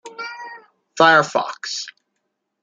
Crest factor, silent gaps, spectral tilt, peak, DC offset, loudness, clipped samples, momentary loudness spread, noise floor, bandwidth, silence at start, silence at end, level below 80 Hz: 20 dB; none; -3 dB/octave; 0 dBFS; under 0.1%; -17 LUFS; under 0.1%; 23 LU; -75 dBFS; 9.4 kHz; 0.05 s; 0.75 s; -72 dBFS